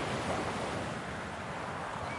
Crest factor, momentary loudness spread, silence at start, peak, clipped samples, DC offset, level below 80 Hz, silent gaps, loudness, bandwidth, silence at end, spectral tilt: 16 dB; 5 LU; 0 s; -20 dBFS; under 0.1%; under 0.1%; -58 dBFS; none; -37 LUFS; 11.5 kHz; 0 s; -4.5 dB/octave